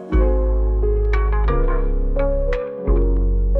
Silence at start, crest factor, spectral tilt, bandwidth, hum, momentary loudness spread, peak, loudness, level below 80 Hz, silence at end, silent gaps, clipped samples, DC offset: 0 s; 10 dB; -10 dB/octave; 4.1 kHz; none; 4 LU; -6 dBFS; -21 LUFS; -18 dBFS; 0 s; none; under 0.1%; under 0.1%